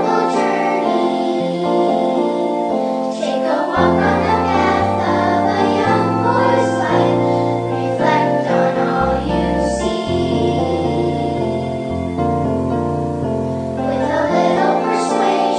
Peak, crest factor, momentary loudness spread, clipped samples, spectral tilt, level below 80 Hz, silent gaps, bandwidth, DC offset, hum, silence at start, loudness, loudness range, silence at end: 0 dBFS; 16 dB; 5 LU; under 0.1%; -6.5 dB/octave; -38 dBFS; none; 10.5 kHz; under 0.1%; none; 0 s; -17 LUFS; 4 LU; 0 s